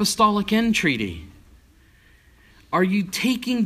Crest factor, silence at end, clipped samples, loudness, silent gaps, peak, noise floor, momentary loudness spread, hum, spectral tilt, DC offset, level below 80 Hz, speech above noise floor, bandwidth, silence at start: 16 dB; 0 s; under 0.1%; -21 LUFS; none; -6 dBFS; -54 dBFS; 8 LU; none; -4 dB/octave; under 0.1%; -50 dBFS; 33 dB; 15.5 kHz; 0 s